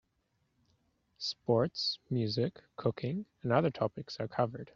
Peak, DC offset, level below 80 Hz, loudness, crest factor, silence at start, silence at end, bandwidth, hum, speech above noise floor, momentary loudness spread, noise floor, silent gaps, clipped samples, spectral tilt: -14 dBFS; under 0.1%; -68 dBFS; -34 LUFS; 22 dB; 1.2 s; 0.05 s; 7.4 kHz; none; 44 dB; 8 LU; -78 dBFS; none; under 0.1%; -5 dB/octave